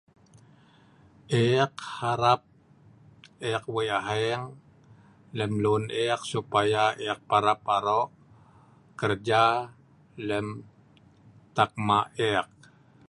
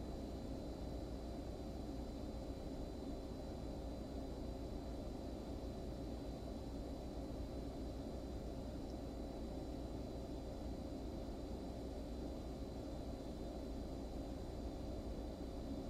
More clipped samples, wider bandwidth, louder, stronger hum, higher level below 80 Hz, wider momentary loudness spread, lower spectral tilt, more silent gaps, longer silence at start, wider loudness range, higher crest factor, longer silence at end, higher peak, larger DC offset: neither; second, 11.5 kHz vs 15.5 kHz; first, -27 LUFS vs -48 LUFS; neither; second, -62 dBFS vs -50 dBFS; first, 12 LU vs 1 LU; second, -5.5 dB/octave vs -7 dB/octave; neither; first, 1.3 s vs 0 s; first, 4 LU vs 0 LU; first, 22 dB vs 14 dB; first, 0.65 s vs 0 s; first, -6 dBFS vs -34 dBFS; neither